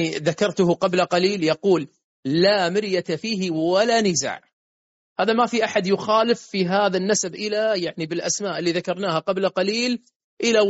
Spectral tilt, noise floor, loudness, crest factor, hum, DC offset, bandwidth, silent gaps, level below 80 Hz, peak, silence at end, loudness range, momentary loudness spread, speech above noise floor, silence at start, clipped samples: -3.5 dB/octave; under -90 dBFS; -21 LUFS; 16 dB; none; under 0.1%; 8 kHz; 2.04-2.23 s, 4.53-5.16 s, 10.16-10.37 s; -66 dBFS; -6 dBFS; 0 s; 2 LU; 7 LU; over 69 dB; 0 s; under 0.1%